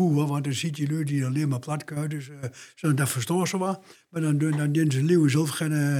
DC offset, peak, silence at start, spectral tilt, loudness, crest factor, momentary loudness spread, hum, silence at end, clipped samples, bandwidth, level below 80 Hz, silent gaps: under 0.1%; -10 dBFS; 0 s; -6 dB/octave; -25 LUFS; 14 dB; 12 LU; none; 0 s; under 0.1%; 16.5 kHz; -80 dBFS; none